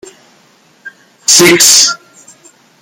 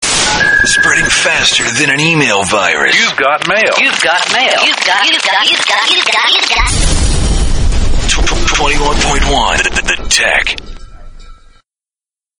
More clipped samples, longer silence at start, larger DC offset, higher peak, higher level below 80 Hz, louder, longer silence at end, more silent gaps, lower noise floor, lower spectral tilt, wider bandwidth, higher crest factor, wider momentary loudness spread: first, 0.7% vs under 0.1%; first, 0.85 s vs 0 s; neither; about the same, 0 dBFS vs 0 dBFS; second, -54 dBFS vs -18 dBFS; first, -5 LUFS vs -9 LUFS; second, 0.85 s vs 1.05 s; neither; second, -47 dBFS vs under -90 dBFS; about the same, -1 dB/octave vs -2 dB/octave; first, over 20 kHz vs 11 kHz; about the same, 12 dB vs 10 dB; first, 14 LU vs 5 LU